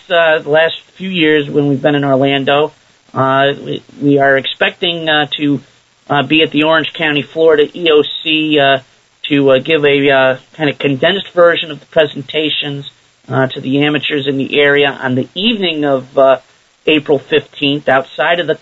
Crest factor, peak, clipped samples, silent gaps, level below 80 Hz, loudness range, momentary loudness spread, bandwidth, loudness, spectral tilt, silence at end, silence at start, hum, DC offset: 12 dB; 0 dBFS; under 0.1%; none; -56 dBFS; 2 LU; 7 LU; 7.8 kHz; -12 LUFS; -6.5 dB/octave; 0.05 s; 0.1 s; none; under 0.1%